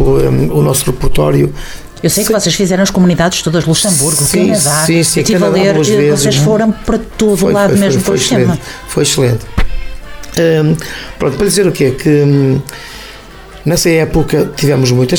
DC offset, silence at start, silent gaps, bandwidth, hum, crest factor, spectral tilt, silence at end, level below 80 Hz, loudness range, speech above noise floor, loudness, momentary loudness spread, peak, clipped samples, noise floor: under 0.1%; 0 s; none; 20 kHz; none; 10 dB; -4.5 dB/octave; 0 s; -24 dBFS; 4 LU; 21 dB; -11 LUFS; 10 LU; 0 dBFS; under 0.1%; -32 dBFS